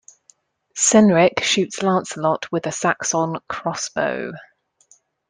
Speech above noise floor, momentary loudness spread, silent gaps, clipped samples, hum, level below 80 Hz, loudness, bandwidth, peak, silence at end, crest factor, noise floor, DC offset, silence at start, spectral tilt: 39 dB; 13 LU; none; under 0.1%; none; -60 dBFS; -19 LUFS; 10 kHz; 0 dBFS; 0.9 s; 20 dB; -58 dBFS; under 0.1%; 0.75 s; -3.5 dB/octave